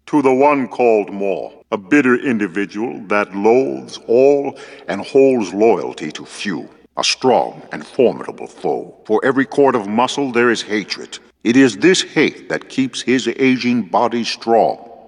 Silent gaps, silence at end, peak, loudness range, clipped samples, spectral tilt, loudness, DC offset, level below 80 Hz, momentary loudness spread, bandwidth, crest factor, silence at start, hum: none; 0.15 s; -2 dBFS; 3 LU; under 0.1%; -4.5 dB/octave; -16 LUFS; under 0.1%; -64 dBFS; 13 LU; 10.5 kHz; 16 dB; 0.05 s; none